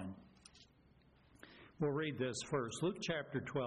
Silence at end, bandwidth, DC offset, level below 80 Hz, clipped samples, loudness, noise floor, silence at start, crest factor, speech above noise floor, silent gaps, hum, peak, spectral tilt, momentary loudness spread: 0 s; 10.5 kHz; under 0.1%; -72 dBFS; under 0.1%; -40 LUFS; -68 dBFS; 0 s; 16 dB; 29 dB; none; none; -28 dBFS; -5 dB/octave; 23 LU